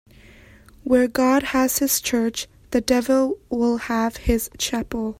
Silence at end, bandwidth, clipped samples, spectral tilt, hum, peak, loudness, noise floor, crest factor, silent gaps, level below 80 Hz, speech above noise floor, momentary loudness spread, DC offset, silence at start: 0.05 s; 16.5 kHz; under 0.1%; -3.5 dB/octave; none; -6 dBFS; -21 LUFS; -48 dBFS; 16 dB; none; -40 dBFS; 27 dB; 7 LU; under 0.1%; 0.85 s